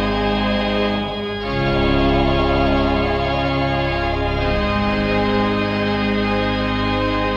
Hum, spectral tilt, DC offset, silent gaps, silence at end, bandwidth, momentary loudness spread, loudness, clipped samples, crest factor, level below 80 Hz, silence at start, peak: none; -7.5 dB/octave; under 0.1%; none; 0 s; 7.6 kHz; 3 LU; -19 LUFS; under 0.1%; 12 dB; -28 dBFS; 0 s; -6 dBFS